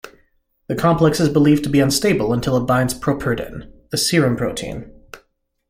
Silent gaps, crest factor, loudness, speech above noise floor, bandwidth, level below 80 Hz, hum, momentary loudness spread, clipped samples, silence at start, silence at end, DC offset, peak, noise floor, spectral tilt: none; 16 dB; -18 LUFS; 46 dB; 16.5 kHz; -42 dBFS; none; 13 LU; under 0.1%; 0.05 s; 0.55 s; under 0.1%; -2 dBFS; -63 dBFS; -5.5 dB/octave